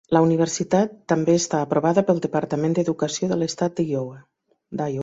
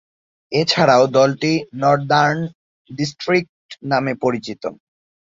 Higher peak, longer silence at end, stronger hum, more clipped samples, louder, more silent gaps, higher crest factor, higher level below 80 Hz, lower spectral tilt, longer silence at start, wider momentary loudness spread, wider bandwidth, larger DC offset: about the same, -4 dBFS vs -2 dBFS; second, 0 s vs 0.55 s; neither; neither; second, -22 LUFS vs -17 LUFS; second, none vs 2.55-2.85 s, 3.49-3.69 s; about the same, 18 dB vs 18 dB; about the same, -62 dBFS vs -60 dBFS; about the same, -5.5 dB/octave vs -5 dB/octave; second, 0.1 s vs 0.5 s; second, 8 LU vs 17 LU; about the same, 8 kHz vs 7.8 kHz; neither